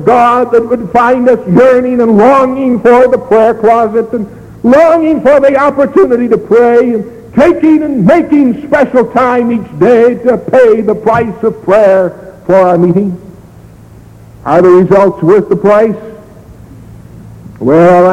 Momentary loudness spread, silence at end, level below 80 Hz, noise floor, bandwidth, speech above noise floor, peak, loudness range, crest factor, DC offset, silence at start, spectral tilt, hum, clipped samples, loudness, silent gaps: 8 LU; 0 s; -40 dBFS; -34 dBFS; 10.5 kHz; 27 dB; 0 dBFS; 3 LU; 8 dB; under 0.1%; 0 s; -8 dB/octave; none; under 0.1%; -7 LUFS; none